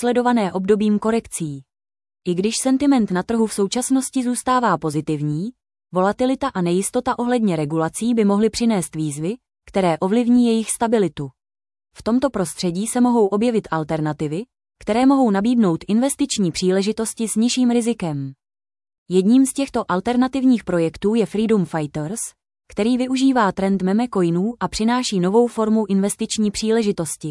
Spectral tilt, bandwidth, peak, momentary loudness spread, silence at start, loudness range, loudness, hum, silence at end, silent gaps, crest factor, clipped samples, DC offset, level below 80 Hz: -5.5 dB/octave; 12 kHz; -4 dBFS; 9 LU; 0 s; 2 LU; -19 LUFS; none; 0 s; 18.98-19.06 s; 14 dB; under 0.1%; under 0.1%; -52 dBFS